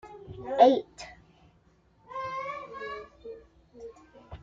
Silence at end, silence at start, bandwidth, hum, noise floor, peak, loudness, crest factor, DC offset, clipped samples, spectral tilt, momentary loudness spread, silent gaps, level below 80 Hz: 0.05 s; 0.05 s; 7.6 kHz; none; -63 dBFS; -6 dBFS; -27 LUFS; 24 dB; under 0.1%; under 0.1%; -5.5 dB/octave; 26 LU; none; -60 dBFS